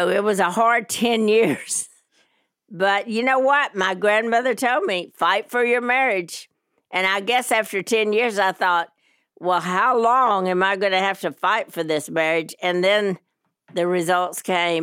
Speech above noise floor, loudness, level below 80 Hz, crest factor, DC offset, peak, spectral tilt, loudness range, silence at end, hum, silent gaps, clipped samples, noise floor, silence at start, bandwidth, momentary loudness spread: 45 dB; -20 LUFS; -74 dBFS; 14 dB; under 0.1%; -6 dBFS; -3.5 dB/octave; 2 LU; 0 s; none; none; under 0.1%; -65 dBFS; 0 s; 17 kHz; 7 LU